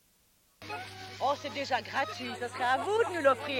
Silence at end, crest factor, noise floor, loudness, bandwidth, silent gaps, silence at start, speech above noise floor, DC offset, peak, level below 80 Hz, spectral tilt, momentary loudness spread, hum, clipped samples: 0 s; 20 dB; -68 dBFS; -31 LUFS; 16.5 kHz; none; 0.6 s; 37 dB; under 0.1%; -12 dBFS; -74 dBFS; -3.5 dB/octave; 14 LU; none; under 0.1%